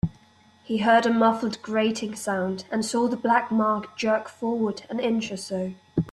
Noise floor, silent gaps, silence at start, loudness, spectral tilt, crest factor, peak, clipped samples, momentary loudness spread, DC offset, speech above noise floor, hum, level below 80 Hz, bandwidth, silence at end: -56 dBFS; none; 0.05 s; -25 LUFS; -5 dB/octave; 18 dB; -8 dBFS; under 0.1%; 10 LU; under 0.1%; 32 dB; none; -56 dBFS; 12.5 kHz; 0 s